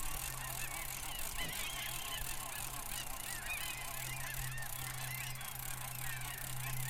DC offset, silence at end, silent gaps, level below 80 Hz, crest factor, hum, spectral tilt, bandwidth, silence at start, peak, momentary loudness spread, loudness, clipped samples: under 0.1%; 0 s; none; -50 dBFS; 18 dB; none; -1.5 dB/octave; 17 kHz; 0 s; -24 dBFS; 2 LU; -41 LUFS; under 0.1%